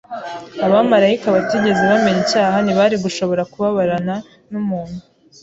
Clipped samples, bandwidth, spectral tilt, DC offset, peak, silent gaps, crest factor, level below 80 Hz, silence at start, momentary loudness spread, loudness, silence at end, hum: under 0.1%; 8 kHz; -5.5 dB/octave; under 0.1%; -2 dBFS; none; 14 dB; -54 dBFS; 0.1 s; 15 LU; -16 LUFS; 0.4 s; none